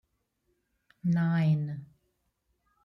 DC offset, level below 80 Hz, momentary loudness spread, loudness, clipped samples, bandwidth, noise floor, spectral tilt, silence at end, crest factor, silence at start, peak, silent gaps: under 0.1%; -72 dBFS; 12 LU; -29 LUFS; under 0.1%; 5.8 kHz; -77 dBFS; -9.5 dB/octave; 1 s; 14 dB; 1.05 s; -18 dBFS; none